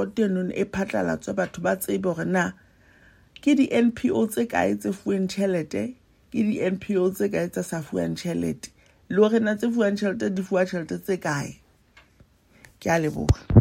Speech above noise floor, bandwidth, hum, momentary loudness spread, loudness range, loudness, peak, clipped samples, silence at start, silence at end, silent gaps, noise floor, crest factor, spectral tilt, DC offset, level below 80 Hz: 34 dB; 16 kHz; none; 9 LU; 3 LU; -25 LUFS; -2 dBFS; under 0.1%; 0 s; 0 s; none; -58 dBFS; 24 dB; -6.5 dB/octave; under 0.1%; -44 dBFS